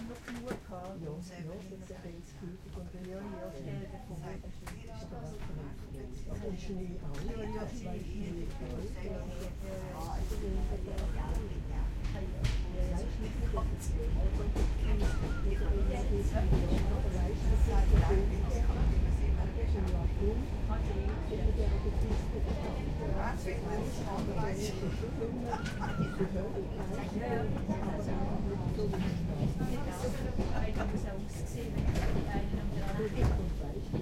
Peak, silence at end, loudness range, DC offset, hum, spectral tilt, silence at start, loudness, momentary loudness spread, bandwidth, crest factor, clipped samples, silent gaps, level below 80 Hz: -14 dBFS; 0 s; 12 LU; under 0.1%; none; -7 dB/octave; 0 s; -36 LUFS; 12 LU; 13.5 kHz; 18 dB; under 0.1%; none; -36 dBFS